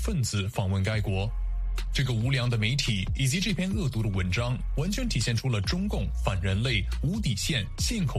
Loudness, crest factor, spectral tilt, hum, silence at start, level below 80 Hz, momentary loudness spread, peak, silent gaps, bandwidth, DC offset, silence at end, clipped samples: -28 LUFS; 16 dB; -5 dB/octave; none; 0 s; -34 dBFS; 4 LU; -10 dBFS; none; 15 kHz; under 0.1%; 0 s; under 0.1%